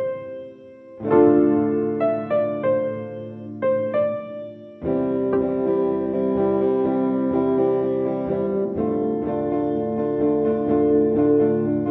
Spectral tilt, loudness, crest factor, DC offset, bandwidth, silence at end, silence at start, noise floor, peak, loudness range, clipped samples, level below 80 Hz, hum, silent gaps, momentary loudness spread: -11.5 dB/octave; -21 LUFS; 18 dB; under 0.1%; 4 kHz; 0 s; 0 s; -42 dBFS; -4 dBFS; 3 LU; under 0.1%; -56 dBFS; none; none; 13 LU